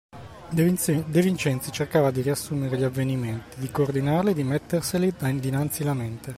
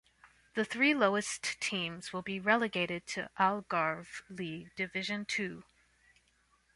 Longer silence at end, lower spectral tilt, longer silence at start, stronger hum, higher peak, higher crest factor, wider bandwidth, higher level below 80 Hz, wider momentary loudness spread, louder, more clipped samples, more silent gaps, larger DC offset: second, 0 s vs 1.15 s; first, -6 dB/octave vs -3.5 dB/octave; about the same, 0.15 s vs 0.25 s; neither; first, -8 dBFS vs -12 dBFS; second, 16 dB vs 22 dB; first, 16 kHz vs 11.5 kHz; first, -54 dBFS vs -72 dBFS; second, 8 LU vs 12 LU; first, -25 LUFS vs -33 LUFS; neither; neither; neither